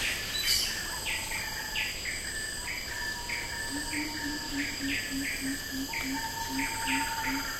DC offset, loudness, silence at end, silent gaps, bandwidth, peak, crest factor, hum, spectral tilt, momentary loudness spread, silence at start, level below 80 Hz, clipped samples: under 0.1%; -31 LUFS; 0 s; none; 16 kHz; -14 dBFS; 20 dB; none; -1.5 dB/octave; 5 LU; 0 s; -48 dBFS; under 0.1%